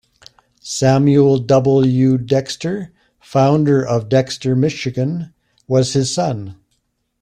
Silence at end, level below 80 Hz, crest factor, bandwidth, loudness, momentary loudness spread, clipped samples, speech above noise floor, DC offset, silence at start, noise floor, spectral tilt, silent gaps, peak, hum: 0.7 s; -52 dBFS; 14 dB; 10.5 kHz; -16 LUFS; 14 LU; under 0.1%; 52 dB; under 0.1%; 0.65 s; -67 dBFS; -6.5 dB/octave; none; -2 dBFS; none